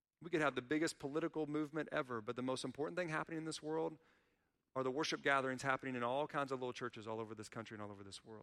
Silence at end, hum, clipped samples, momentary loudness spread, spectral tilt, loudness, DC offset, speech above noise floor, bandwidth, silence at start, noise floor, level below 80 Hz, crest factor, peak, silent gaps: 0 s; none; under 0.1%; 11 LU; -4.5 dB/octave; -41 LUFS; under 0.1%; 41 dB; 13.5 kHz; 0.2 s; -82 dBFS; -80 dBFS; 20 dB; -22 dBFS; none